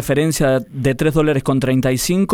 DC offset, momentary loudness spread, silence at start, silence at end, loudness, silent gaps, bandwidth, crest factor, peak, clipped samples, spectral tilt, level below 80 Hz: under 0.1%; 2 LU; 0 s; 0 s; -17 LUFS; none; 17.5 kHz; 12 dB; -4 dBFS; under 0.1%; -5.5 dB/octave; -36 dBFS